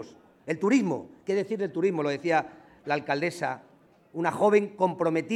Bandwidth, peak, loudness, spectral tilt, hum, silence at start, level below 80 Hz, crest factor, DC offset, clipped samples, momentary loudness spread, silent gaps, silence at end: 12.5 kHz; -10 dBFS; -27 LUFS; -6 dB/octave; none; 0 s; -76 dBFS; 18 dB; under 0.1%; under 0.1%; 18 LU; none; 0 s